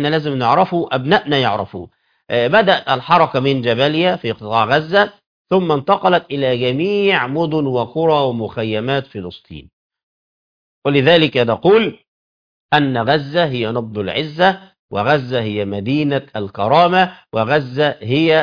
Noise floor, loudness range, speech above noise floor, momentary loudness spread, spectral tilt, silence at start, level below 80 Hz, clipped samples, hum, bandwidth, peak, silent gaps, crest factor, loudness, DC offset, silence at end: under -90 dBFS; 3 LU; over 74 dB; 9 LU; -7.5 dB/octave; 0 s; -54 dBFS; under 0.1%; none; 5.4 kHz; 0 dBFS; 5.26-5.45 s, 9.73-9.90 s, 10.03-10.82 s, 12.08-12.69 s, 14.79-14.89 s; 16 dB; -16 LUFS; under 0.1%; 0 s